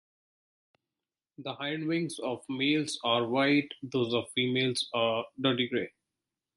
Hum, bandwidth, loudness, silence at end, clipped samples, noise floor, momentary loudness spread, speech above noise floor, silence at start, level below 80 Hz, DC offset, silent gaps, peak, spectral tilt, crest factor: none; 11.5 kHz; -30 LUFS; 0.7 s; under 0.1%; under -90 dBFS; 9 LU; over 60 dB; 1.4 s; -74 dBFS; under 0.1%; none; -12 dBFS; -4.5 dB/octave; 20 dB